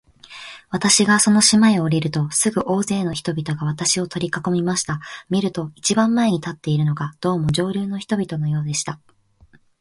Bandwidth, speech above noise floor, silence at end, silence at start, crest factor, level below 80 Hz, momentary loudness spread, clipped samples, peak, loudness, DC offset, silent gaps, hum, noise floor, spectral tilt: 11.5 kHz; 34 dB; 0.85 s; 0.3 s; 20 dB; -52 dBFS; 12 LU; under 0.1%; 0 dBFS; -19 LUFS; under 0.1%; none; none; -53 dBFS; -4 dB/octave